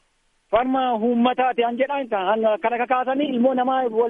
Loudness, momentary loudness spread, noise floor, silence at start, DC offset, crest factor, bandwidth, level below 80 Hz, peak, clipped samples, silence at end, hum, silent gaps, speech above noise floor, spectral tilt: -21 LUFS; 3 LU; -65 dBFS; 0.5 s; under 0.1%; 16 dB; 3.8 kHz; -58 dBFS; -4 dBFS; under 0.1%; 0 s; none; none; 45 dB; -7.5 dB/octave